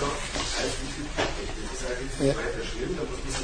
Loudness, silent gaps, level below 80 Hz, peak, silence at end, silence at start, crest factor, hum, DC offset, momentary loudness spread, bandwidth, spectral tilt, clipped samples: -30 LUFS; none; -36 dBFS; -10 dBFS; 0 s; 0 s; 18 dB; none; under 0.1%; 6 LU; 10.5 kHz; -3.5 dB/octave; under 0.1%